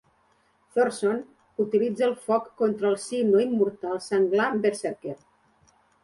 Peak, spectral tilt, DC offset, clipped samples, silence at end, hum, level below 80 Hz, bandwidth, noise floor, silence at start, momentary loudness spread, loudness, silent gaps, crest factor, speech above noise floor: -10 dBFS; -5.5 dB/octave; under 0.1%; under 0.1%; 0.9 s; none; -72 dBFS; 11.5 kHz; -65 dBFS; 0.75 s; 11 LU; -25 LUFS; none; 16 dB; 41 dB